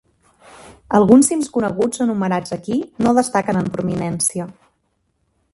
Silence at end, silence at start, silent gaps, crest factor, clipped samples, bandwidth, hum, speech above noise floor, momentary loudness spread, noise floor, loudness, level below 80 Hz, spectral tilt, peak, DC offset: 1.05 s; 0.65 s; none; 18 dB; under 0.1%; 12 kHz; none; 50 dB; 11 LU; -67 dBFS; -17 LUFS; -52 dBFS; -5.5 dB/octave; 0 dBFS; under 0.1%